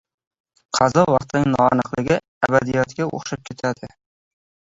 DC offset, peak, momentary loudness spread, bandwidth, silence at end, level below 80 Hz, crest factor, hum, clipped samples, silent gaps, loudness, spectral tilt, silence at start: under 0.1%; -2 dBFS; 11 LU; 8 kHz; 0.9 s; -50 dBFS; 20 dB; none; under 0.1%; 2.28-2.41 s; -20 LUFS; -5.5 dB/octave; 0.75 s